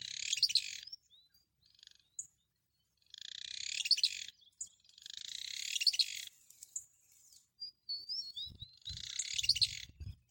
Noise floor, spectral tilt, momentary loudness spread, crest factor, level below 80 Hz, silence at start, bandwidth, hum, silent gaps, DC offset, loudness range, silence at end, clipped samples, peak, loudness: -82 dBFS; 2 dB/octave; 20 LU; 26 dB; -66 dBFS; 0 s; 17 kHz; none; none; under 0.1%; 7 LU; 0.15 s; under 0.1%; -16 dBFS; -35 LUFS